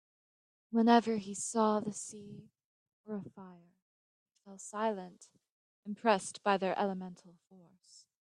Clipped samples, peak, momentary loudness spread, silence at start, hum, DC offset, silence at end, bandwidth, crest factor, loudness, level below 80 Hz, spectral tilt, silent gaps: under 0.1%; -12 dBFS; 24 LU; 0.7 s; none; under 0.1%; 1 s; 11 kHz; 24 dB; -33 LUFS; -82 dBFS; -4.5 dB/octave; 2.65-2.86 s, 2.93-3.04 s, 3.82-4.26 s, 5.50-5.83 s